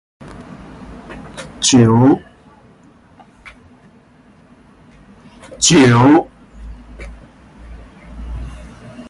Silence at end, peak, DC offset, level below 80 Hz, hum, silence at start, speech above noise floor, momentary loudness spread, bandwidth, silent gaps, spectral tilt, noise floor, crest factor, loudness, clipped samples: 0.05 s; -2 dBFS; under 0.1%; -38 dBFS; none; 0.4 s; 38 dB; 28 LU; 11.5 kHz; none; -4.5 dB/octave; -47 dBFS; 16 dB; -11 LUFS; under 0.1%